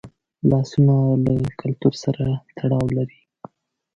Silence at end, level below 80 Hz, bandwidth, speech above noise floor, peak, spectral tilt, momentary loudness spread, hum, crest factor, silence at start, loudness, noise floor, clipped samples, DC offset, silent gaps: 0.9 s; -46 dBFS; 7.6 kHz; 32 dB; -4 dBFS; -8.5 dB/octave; 8 LU; none; 16 dB; 0.05 s; -21 LUFS; -51 dBFS; under 0.1%; under 0.1%; none